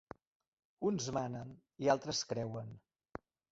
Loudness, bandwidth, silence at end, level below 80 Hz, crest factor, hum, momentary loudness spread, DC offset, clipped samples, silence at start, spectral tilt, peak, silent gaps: -38 LUFS; 7.6 kHz; 0.75 s; -70 dBFS; 22 dB; none; 20 LU; under 0.1%; under 0.1%; 0.8 s; -4.5 dB/octave; -18 dBFS; none